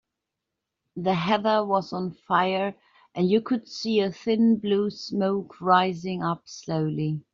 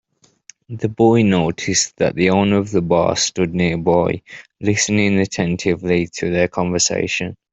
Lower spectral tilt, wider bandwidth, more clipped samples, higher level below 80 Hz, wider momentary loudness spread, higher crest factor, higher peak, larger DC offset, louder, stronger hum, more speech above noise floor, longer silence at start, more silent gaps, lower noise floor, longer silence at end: about the same, -5 dB/octave vs -4.5 dB/octave; second, 7.4 kHz vs 8.4 kHz; neither; second, -66 dBFS vs -50 dBFS; about the same, 9 LU vs 7 LU; first, 20 dB vs 14 dB; second, -6 dBFS vs -2 dBFS; neither; second, -25 LUFS vs -17 LUFS; neither; first, 60 dB vs 31 dB; first, 0.95 s vs 0.7 s; neither; first, -84 dBFS vs -49 dBFS; about the same, 0.15 s vs 0.2 s